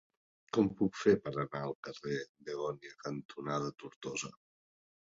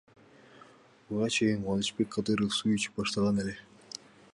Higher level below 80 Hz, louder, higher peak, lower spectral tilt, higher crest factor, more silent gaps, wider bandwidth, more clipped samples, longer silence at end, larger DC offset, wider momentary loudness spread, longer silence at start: second, -70 dBFS vs -60 dBFS; second, -36 LUFS vs -30 LUFS; about the same, -14 dBFS vs -16 dBFS; about the same, -5.5 dB/octave vs -4.5 dB/octave; first, 22 dB vs 16 dB; first, 1.75-1.83 s, 2.29-2.35 s, 3.25-3.29 s, 3.96-4.01 s vs none; second, 7.6 kHz vs 11.5 kHz; neither; about the same, 0.7 s vs 0.7 s; neither; second, 13 LU vs 17 LU; about the same, 0.55 s vs 0.55 s